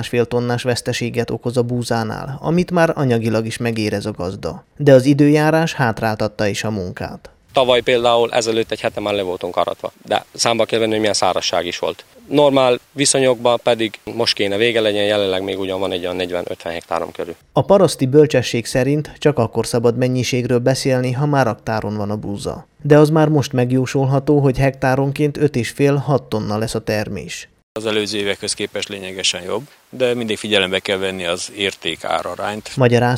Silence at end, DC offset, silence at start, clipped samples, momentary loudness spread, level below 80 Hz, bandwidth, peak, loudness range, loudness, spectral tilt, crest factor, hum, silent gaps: 0 s; under 0.1%; 0 s; under 0.1%; 11 LU; -48 dBFS; 16 kHz; 0 dBFS; 4 LU; -17 LUFS; -5 dB/octave; 18 dB; none; 27.63-27.75 s